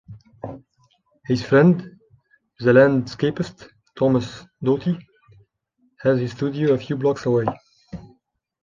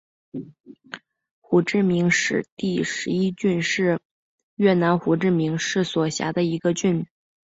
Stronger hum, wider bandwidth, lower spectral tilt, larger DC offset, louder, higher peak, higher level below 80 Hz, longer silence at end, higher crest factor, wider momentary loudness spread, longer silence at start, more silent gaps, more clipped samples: neither; about the same, 7.4 kHz vs 8 kHz; first, -8 dB/octave vs -5.5 dB/octave; neither; about the same, -20 LUFS vs -22 LUFS; first, -2 dBFS vs -6 dBFS; first, -56 dBFS vs -62 dBFS; first, 0.6 s vs 0.45 s; about the same, 20 dB vs 16 dB; first, 22 LU vs 18 LU; second, 0.1 s vs 0.35 s; second, none vs 0.60-0.64 s, 1.31-1.42 s, 2.52-2.57 s, 4.05-4.57 s; neither